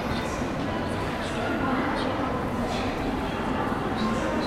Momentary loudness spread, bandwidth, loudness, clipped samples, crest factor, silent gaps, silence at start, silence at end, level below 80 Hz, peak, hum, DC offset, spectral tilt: 3 LU; 16 kHz; -28 LUFS; under 0.1%; 14 dB; none; 0 s; 0 s; -40 dBFS; -14 dBFS; none; 0.1%; -6 dB/octave